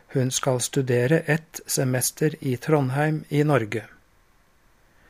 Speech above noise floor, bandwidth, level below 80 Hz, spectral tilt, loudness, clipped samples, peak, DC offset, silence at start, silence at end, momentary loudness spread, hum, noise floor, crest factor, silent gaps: 37 dB; 15.5 kHz; -62 dBFS; -5 dB/octave; -23 LUFS; under 0.1%; -6 dBFS; under 0.1%; 0.1 s; 1.25 s; 5 LU; none; -60 dBFS; 18 dB; none